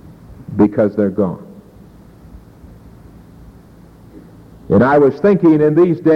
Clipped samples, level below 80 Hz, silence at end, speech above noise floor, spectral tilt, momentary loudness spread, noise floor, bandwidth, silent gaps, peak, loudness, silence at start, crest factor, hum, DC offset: under 0.1%; -46 dBFS; 0 s; 30 dB; -10 dB/octave; 12 LU; -42 dBFS; 5.8 kHz; none; -2 dBFS; -13 LUFS; 0.3 s; 14 dB; none; under 0.1%